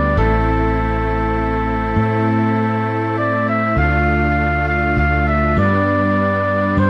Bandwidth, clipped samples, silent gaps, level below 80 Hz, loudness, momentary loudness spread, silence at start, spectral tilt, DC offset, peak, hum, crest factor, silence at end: 6.4 kHz; under 0.1%; none; -24 dBFS; -17 LUFS; 3 LU; 0 s; -9 dB/octave; under 0.1%; -4 dBFS; none; 12 dB; 0 s